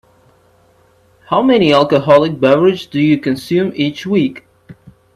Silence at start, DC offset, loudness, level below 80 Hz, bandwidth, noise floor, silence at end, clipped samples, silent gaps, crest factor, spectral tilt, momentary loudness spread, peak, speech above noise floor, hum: 1.3 s; under 0.1%; -13 LUFS; -54 dBFS; 13.5 kHz; -51 dBFS; 0.4 s; under 0.1%; none; 14 dB; -7 dB/octave; 7 LU; 0 dBFS; 39 dB; none